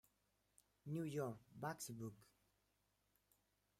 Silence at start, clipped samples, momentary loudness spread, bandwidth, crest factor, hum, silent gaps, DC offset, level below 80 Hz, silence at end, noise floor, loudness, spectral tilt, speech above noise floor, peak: 0.85 s; under 0.1%; 12 LU; 16 kHz; 20 dB; 50 Hz at -80 dBFS; none; under 0.1%; -84 dBFS; 1.55 s; -84 dBFS; -49 LUFS; -5.5 dB/octave; 36 dB; -34 dBFS